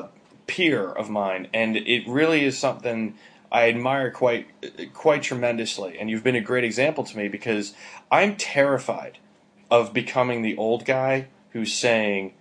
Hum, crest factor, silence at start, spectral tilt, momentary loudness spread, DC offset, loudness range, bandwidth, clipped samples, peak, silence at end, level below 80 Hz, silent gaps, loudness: none; 20 dB; 0 s; -4.5 dB/octave; 11 LU; under 0.1%; 2 LU; 10.5 kHz; under 0.1%; -4 dBFS; 0.1 s; -72 dBFS; none; -23 LUFS